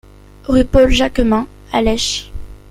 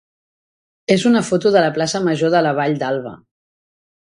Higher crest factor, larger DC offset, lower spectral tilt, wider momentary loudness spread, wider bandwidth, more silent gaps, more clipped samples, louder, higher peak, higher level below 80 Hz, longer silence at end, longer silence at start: about the same, 14 dB vs 18 dB; neither; about the same, -4.5 dB/octave vs -5 dB/octave; first, 19 LU vs 9 LU; first, 14.5 kHz vs 11 kHz; neither; neither; about the same, -15 LUFS vs -17 LUFS; about the same, -2 dBFS vs 0 dBFS; first, -24 dBFS vs -60 dBFS; second, 0.15 s vs 0.9 s; second, 0.5 s vs 0.9 s